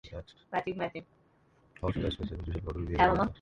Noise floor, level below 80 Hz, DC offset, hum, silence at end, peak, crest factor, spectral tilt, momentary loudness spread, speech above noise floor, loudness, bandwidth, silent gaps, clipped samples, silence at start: -66 dBFS; -44 dBFS; under 0.1%; none; 0.05 s; -12 dBFS; 22 dB; -7.5 dB/octave; 16 LU; 34 dB; -32 LUFS; 9.6 kHz; none; under 0.1%; 0.05 s